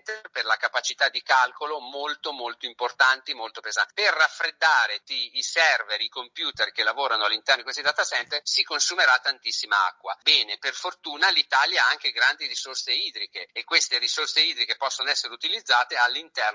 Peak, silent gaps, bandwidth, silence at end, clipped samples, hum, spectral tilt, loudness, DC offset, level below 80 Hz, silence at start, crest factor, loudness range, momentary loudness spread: -6 dBFS; none; 7.8 kHz; 0 s; under 0.1%; none; 2 dB/octave; -23 LUFS; under 0.1%; -80 dBFS; 0.05 s; 20 dB; 3 LU; 10 LU